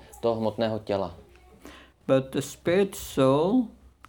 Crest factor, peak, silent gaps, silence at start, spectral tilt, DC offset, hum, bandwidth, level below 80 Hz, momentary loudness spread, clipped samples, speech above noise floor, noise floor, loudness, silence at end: 18 dB; -10 dBFS; none; 0.15 s; -6 dB/octave; under 0.1%; none; 19 kHz; -56 dBFS; 10 LU; under 0.1%; 25 dB; -50 dBFS; -26 LUFS; 0.4 s